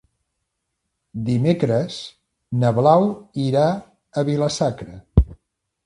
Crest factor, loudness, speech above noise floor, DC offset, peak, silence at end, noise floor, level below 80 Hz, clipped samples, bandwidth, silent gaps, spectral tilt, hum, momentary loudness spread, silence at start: 20 dB; -20 LUFS; 58 dB; under 0.1%; 0 dBFS; 0.5 s; -77 dBFS; -32 dBFS; under 0.1%; 11 kHz; none; -7 dB/octave; none; 14 LU; 1.15 s